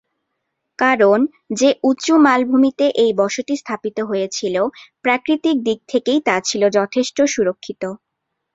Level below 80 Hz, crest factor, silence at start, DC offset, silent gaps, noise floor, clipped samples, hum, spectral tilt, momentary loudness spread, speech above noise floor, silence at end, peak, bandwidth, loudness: -62 dBFS; 16 dB; 0.8 s; under 0.1%; none; -76 dBFS; under 0.1%; none; -4 dB/octave; 10 LU; 60 dB; 0.6 s; -2 dBFS; 7.8 kHz; -17 LUFS